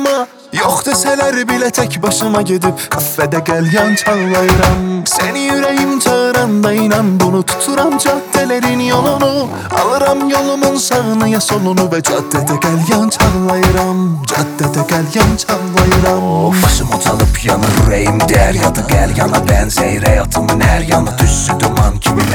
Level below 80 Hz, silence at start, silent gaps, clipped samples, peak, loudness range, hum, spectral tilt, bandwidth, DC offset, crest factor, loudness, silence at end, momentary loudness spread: -22 dBFS; 0 s; none; under 0.1%; 0 dBFS; 1 LU; none; -4.5 dB/octave; over 20 kHz; under 0.1%; 12 dB; -12 LUFS; 0 s; 4 LU